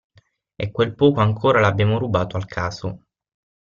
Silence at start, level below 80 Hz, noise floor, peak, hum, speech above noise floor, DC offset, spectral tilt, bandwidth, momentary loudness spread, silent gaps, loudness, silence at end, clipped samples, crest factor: 0.6 s; -50 dBFS; -49 dBFS; -2 dBFS; none; 30 dB; under 0.1%; -7 dB/octave; 7.2 kHz; 14 LU; none; -20 LUFS; 0.75 s; under 0.1%; 18 dB